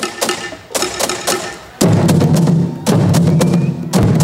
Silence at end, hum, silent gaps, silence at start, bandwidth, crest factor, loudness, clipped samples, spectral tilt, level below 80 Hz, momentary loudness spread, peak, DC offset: 0 s; none; none; 0 s; 16 kHz; 12 dB; -14 LUFS; under 0.1%; -5.5 dB/octave; -40 dBFS; 8 LU; -2 dBFS; under 0.1%